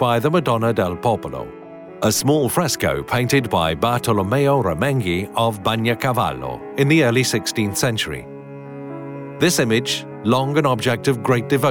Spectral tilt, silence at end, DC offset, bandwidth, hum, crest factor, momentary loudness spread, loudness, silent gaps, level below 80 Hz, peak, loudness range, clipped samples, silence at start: -5 dB/octave; 0 s; under 0.1%; 19 kHz; none; 14 dB; 15 LU; -19 LUFS; none; -50 dBFS; -6 dBFS; 2 LU; under 0.1%; 0 s